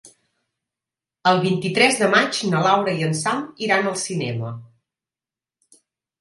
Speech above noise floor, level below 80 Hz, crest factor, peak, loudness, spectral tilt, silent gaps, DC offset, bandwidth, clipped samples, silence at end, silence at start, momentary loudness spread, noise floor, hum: over 70 dB; -68 dBFS; 22 dB; -2 dBFS; -20 LUFS; -4 dB/octave; none; under 0.1%; 11.5 kHz; under 0.1%; 1.55 s; 0.05 s; 9 LU; under -90 dBFS; none